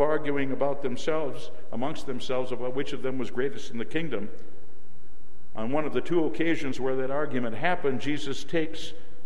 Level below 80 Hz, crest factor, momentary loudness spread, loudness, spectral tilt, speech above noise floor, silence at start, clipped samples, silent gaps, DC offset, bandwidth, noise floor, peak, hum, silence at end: -58 dBFS; 20 dB; 10 LU; -30 LUFS; -6 dB/octave; 26 dB; 0 s; under 0.1%; none; 8%; 13 kHz; -56 dBFS; -12 dBFS; none; 0.05 s